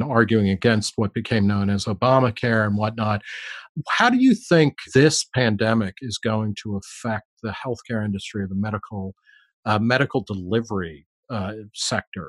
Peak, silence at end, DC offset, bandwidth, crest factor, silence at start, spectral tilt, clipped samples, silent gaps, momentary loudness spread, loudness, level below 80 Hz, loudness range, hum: -2 dBFS; 0 s; under 0.1%; 12 kHz; 18 dB; 0 s; -5.5 dB/octave; under 0.1%; 3.69-3.75 s, 7.25-7.37 s, 9.53-9.63 s, 11.06-11.23 s, 12.07-12.12 s; 14 LU; -22 LUFS; -56 dBFS; 8 LU; none